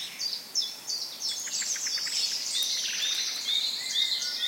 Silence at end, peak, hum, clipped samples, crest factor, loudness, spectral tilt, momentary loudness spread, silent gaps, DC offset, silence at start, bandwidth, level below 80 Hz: 0 s; -12 dBFS; none; under 0.1%; 18 dB; -28 LUFS; 3 dB/octave; 5 LU; none; under 0.1%; 0 s; 16.5 kHz; -88 dBFS